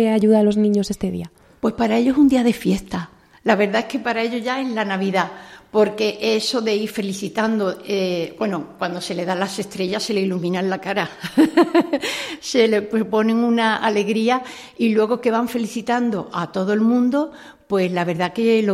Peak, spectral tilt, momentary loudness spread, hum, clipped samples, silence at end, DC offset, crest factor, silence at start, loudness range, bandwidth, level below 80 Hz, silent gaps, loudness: -2 dBFS; -5.5 dB/octave; 10 LU; none; under 0.1%; 0 s; under 0.1%; 18 dB; 0 s; 4 LU; 14.5 kHz; -54 dBFS; none; -20 LUFS